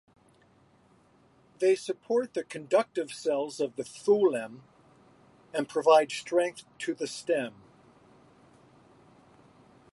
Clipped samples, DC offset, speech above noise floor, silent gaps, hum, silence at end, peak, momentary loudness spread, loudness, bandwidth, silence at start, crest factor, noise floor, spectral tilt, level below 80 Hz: under 0.1%; under 0.1%; 35 dB; none; none; 2.45 s; -10 dBFS; 13 LU; -29 LUFS; 11.5 kHz; 1.6 s; 22 dB; -63 dBFS; -4 dB/octave; -78 dBFS